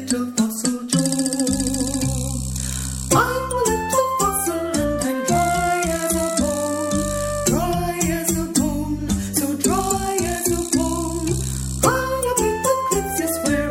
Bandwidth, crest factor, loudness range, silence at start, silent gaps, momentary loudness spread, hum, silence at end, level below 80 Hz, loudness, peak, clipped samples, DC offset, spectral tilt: 17 kHz; 18 dB; 1 LU; 0 s; none; 4 LU; none; 0 s; -34 dBFS; -21 LUFS; -2 dBFS; under 0.1%; under 0.1%; -4 dB/octave